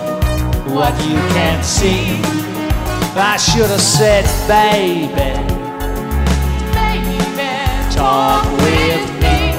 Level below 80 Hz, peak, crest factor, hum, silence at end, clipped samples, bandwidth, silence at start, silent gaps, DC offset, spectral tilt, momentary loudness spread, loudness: -20 dBFS; -2 dBFS; 12 dB; none; 0 s; under 0.1%; 16.5 kHz; 0 s; none; under 0.1%; -4.5 dB/octave; 7 LU; -14 LUFS